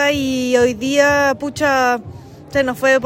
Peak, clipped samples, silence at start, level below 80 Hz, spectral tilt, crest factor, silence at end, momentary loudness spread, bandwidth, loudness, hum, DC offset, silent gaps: -2 dBFS; under 0.1%; 0 s; -48 dBFS; -4 dB/octave; 14 dB; 0 s; 7 LU; 16.5 kHz; -16 LUFS; none; under 0.1%; none